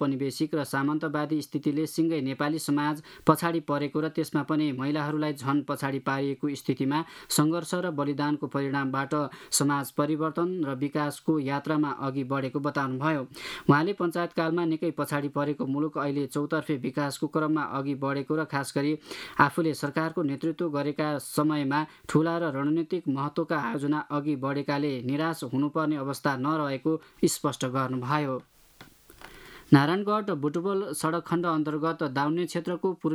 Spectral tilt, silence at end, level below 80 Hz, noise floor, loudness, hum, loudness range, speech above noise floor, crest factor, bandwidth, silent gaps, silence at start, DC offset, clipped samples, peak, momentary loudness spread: -5.5 dB/octave; 0 s; -68 dBFS; -54 dBFS; -28 LUFS; none; 2 LU; 26 dB; 24 dB; 15 kHz; none; 0 s; under 0.1%; under 0.1%; -4 dBFS; 5 LU